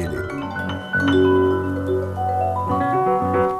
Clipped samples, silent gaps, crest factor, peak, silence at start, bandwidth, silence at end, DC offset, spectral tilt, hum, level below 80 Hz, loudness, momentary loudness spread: under 0.1%; none; 12 dB; -8 dBFS; 0 s; 13.5 kHz; 0 s; under 0.1%; -7.5 dB/octave; none; -46 dBFS; -20 LUFS; 10 LU